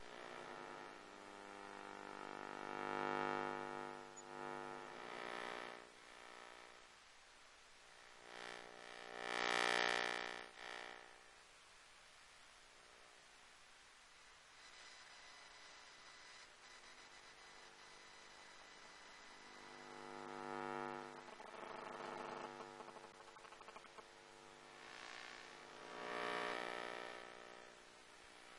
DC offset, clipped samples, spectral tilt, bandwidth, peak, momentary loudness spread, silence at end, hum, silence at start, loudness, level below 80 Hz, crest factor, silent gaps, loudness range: under 0.1%; under 0.1%; -2.5 dB/octave; 11.5 kHz; -22 dBFS; 19 LU; 0 s; none; 0 s; -49 LUFS; -80 dBFS; 28 dB; none; 16 LU